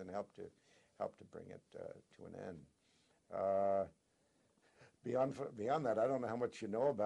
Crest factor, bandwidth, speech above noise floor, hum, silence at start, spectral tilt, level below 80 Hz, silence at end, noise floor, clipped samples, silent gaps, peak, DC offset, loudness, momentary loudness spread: 18 dB; 11 kHz; 37 dB; none; 0 s; -7 dB/octave; -80 dBFS; 0 s; -77 dBFS; under 0.1%; none; -24 dBFS; under 0.1%; -40 LUFS; 19 LU